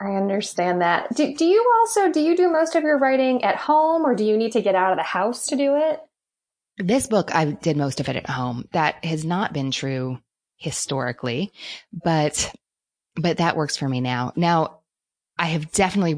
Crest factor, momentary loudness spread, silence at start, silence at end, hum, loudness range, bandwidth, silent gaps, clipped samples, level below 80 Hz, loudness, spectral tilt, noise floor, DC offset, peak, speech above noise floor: 16 dB; 10 LU; 0 s; 0 s; none; 7 LU; 10.5 kHz; none; under 0.1%; -56 dBFS; -21 LUFS; -5 dB/octave; -89 dBFS; under 0.1%; -6 dBFS; 68 dB